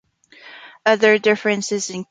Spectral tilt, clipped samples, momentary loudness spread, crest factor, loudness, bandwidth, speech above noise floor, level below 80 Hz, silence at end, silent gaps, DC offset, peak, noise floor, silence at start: -3.5 dB/octave; under 0.1%; 9 LU; 18 dB; -18 LUFS; 9.4 kHz; 29 dB; -68 dBFS; 0.1 s; none; under 0.1%; -2 dBFS; -46 dBFS; 0.45 s